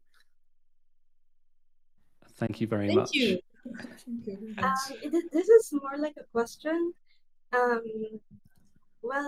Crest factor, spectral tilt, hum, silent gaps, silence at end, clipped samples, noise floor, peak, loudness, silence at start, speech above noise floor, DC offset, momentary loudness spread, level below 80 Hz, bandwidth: 22 dB; -5 dB/octave; none; none; 0 s; under 0.1%; -59 dBFS; -8 dBFS; -29 LUFS; 2.4 s; 31 dB; under 0.1%; 19 LU; -66 dBFS; 15.5 kHz